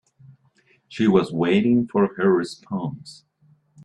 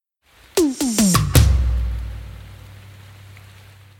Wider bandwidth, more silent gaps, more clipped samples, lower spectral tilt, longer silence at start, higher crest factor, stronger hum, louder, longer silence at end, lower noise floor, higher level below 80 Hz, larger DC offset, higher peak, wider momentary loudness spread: second, 10.5 kHz vs 19 kHz; neither; neither; first, -7.5 dB/octave vs -5 dB/octave; first, 0.9 s vs 0.55 s; about the same, 18 dB vs 20 dB; neither; second, -21 LUFS vs -18 LUFS; first, 0.75 s vs 0.6 s; first, -61 dBFS vs -53 dBFS; second, -60 dBFS vs -24 dBFS; neither; second, -4 dBFS vs 0 dBFS; second, 13 LU vs 23 LU